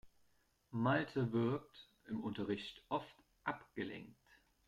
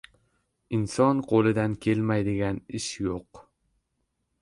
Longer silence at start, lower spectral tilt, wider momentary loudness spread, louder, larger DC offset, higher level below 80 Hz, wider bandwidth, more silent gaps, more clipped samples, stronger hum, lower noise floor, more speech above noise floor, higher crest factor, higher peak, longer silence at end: second, 0.05 s vs 0.7 s; about the same, -7.5 dB/octave vs -6.5 dB/octave; first, 19 LU vs 10 LU; second, -41 LUFS vs -26 LUFS; neither; second, -74 dBFS vs -54 dBFS; about the same, 11 kHz vs 11.5 kHz; neither; neither; neither; about the same, -77 dBFS vs -77 dBFS; second, 36 dB vs 52 dB; about the same, 20 dB vs 18 dB; second, -22 dBFS vs -10 dBFS; second, 0.55 s vs 1 s